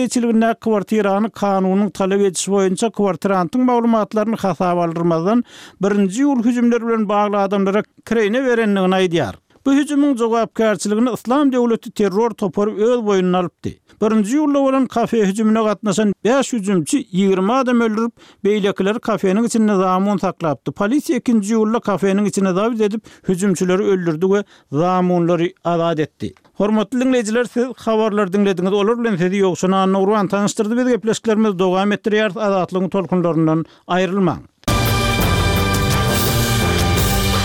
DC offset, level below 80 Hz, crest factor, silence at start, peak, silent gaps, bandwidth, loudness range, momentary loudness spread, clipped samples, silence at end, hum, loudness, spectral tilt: under 0.1%; -36 dBFS; 12 dB; 0 s; -6 dBFS; none; 16.5 kHz; 1 LU; 4 LU; under 0.1%; 0 s; none; -17 LUFS; -5.5 dB/octave